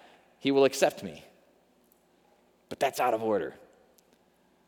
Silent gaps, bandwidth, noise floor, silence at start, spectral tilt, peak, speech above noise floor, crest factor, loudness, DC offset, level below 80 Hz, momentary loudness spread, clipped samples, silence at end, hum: none; 19.5 kHz; -66 dBFS; 0.45 s; -4 dB/octave; -8 dBFS; 39 dB; 22 dB; -28 LUFS; under 0.1%; -74 dBFS; 19 LU; under 0.1%; 1.1 s; 60 Hz at -70 dBFS